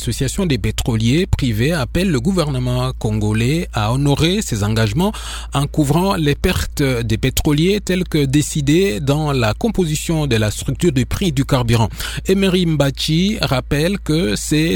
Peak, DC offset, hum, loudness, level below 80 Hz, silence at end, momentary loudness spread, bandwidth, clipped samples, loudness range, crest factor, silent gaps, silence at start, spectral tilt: 0 dBFS; under 0.1%; none; -17 LUFS; -28 dBFS; 0 s; 4 LU; 18.5 kHz; under 0.1%; 1 LU; 16 dB; none; 0 s; -5.5 dB/octave